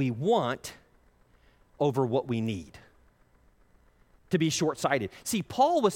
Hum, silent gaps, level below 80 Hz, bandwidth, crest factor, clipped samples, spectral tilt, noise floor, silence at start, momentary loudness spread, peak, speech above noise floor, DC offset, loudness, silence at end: none; none; -62 dBFS; 16.5 kHz; 18 dB; under 0.1%; -5 dB/octave; -63 dBFS; 0 s; 11 LU; -10 dBFS; 35 dB; under 0.1%; -28 LUFS; 0 s